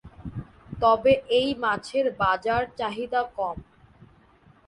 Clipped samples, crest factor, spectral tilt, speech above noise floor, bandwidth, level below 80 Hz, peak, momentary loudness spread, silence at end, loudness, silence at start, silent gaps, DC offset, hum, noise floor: under 0.1%; 20 dB; -5.5 dB/octave; 33 dB; 11 kHz; -50 dBFS; -6 dBFS; 18 LU; 0.65 s; -24 LUFS; 0.05 s; none; under 0.1%; none; -57 dBFS